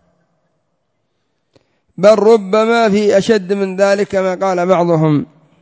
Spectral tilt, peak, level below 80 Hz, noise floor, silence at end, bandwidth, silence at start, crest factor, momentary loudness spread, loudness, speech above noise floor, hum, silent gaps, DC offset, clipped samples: -6.5 dB/octave; 0 dBFS; -56 dBFS; -68 dBFS; 0.4 s; 8 kHz; 2 s; 14 dB; 6 LU; -13 LUFS; 56 dB; none; none; under 0.1%; under 0.1%